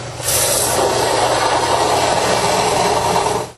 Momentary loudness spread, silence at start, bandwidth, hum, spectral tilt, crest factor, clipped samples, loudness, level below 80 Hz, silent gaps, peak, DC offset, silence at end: 2 LU; 0 s; 13 kHz; none; -2.5 dB/octave; 14 dB; under 0.1%; -15 LUFS; -40 dBFS; none; -2 dBFS; under 0.1%; 0.05 s